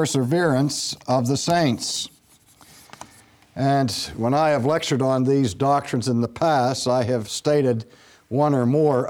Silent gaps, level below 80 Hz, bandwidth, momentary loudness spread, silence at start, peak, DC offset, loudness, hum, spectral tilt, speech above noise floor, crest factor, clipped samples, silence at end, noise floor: none; -58 dBFS; 18 kHz; 6 LU; 0 s; -6 dBFS; under 0.1%; -21 LUFS; none; -5.5 dB/octave; 34 dB; 16 dB; under 0.1%; 0 s; -54 dBFS